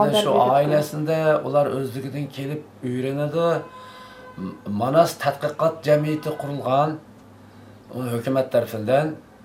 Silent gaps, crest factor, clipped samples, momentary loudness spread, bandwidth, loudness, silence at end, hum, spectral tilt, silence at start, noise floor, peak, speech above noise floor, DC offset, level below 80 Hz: none; 20 dB; under 0.1%; 16 LU; 16 kHz; -22 LUFS; 0.25 s; none; -6 dB/octave; 0 s; -46 dBFS; -4 dBFS; 25 dB; under 0.1%; -66 dBFS